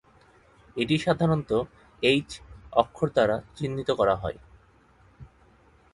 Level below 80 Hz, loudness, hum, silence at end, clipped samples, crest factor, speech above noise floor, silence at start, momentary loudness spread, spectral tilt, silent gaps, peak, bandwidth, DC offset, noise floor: -52 dBFS; -26 LUFS; none; 0.65 s; under 0.1%; 24 dB; 33 dB; 0.75 s; 16 LU; -6 dB/octave; none; -4 dBFS; 11.5 kHz; under 0.1%; -58 dBFS